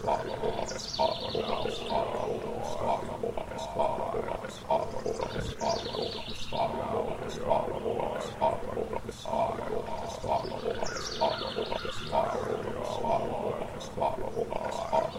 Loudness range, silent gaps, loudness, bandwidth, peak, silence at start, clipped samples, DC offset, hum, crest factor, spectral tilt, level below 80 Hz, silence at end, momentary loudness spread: 1 LU; none; -32 LUFS; 16 kHz; -12 dBFS; 0 s; under 0.1%; under 0.1%; none; 20 dB; -4.5 dB/octave; -48 dBFS; 0 s; 5 LU